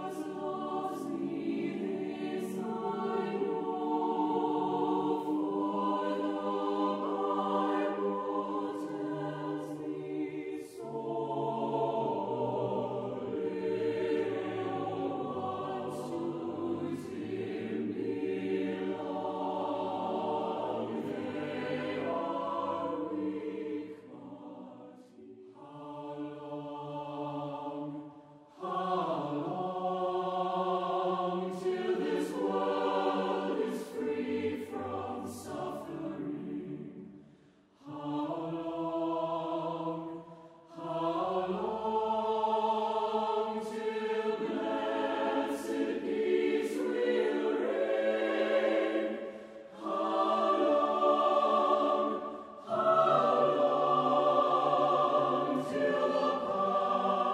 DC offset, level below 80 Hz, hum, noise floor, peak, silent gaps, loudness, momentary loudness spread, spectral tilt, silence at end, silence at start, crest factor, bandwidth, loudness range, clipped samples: under 0.1%; -74 dBFS; none; -62 dBFS; -14 dBFS; none; -33 LUFS; 13 LU; -6.5 dB/octave; 0 s; 0 s; 18 dB; 14 kHz; 10 LU; under 0.1%